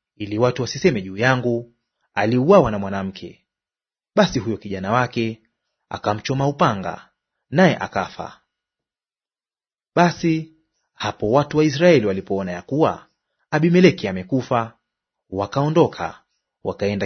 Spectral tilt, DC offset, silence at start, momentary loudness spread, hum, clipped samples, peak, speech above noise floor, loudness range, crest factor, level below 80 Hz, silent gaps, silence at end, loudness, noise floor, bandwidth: -6.5 dB/octave; under 0.1%; 0.2 s; 16 LU; none; under 0.1%; 0 dBFS; over 71 dB; 5 LU; 20 dB; -52 dBFS; none; 0 s; -20 LUFS; under -90 dBFS; 6.6 kHz